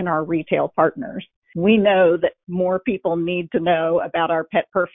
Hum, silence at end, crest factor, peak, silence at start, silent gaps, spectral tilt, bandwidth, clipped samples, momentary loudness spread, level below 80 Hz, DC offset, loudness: none; 0.05 s; 16 dB; -4 dBFS; 0 s; 1.36-1.42 s; -11.5 dB/octave; 3.8 kHz; under 0.1%; 8 LU; -56 dBFS; under 0.1%; -19 LUFS